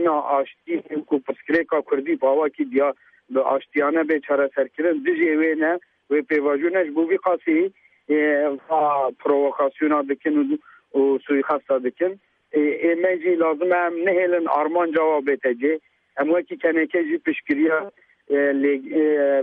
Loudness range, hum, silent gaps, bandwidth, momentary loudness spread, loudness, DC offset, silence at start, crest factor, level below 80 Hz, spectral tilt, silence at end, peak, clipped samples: 2 LU; none; none; 4.4 kHz; 6 LU; -21 LUFS; under 0.1%; 0 s; 14 dB; -74 dBFS; -8 dB/octave; 0 s; -6 dBFS; under 0.1%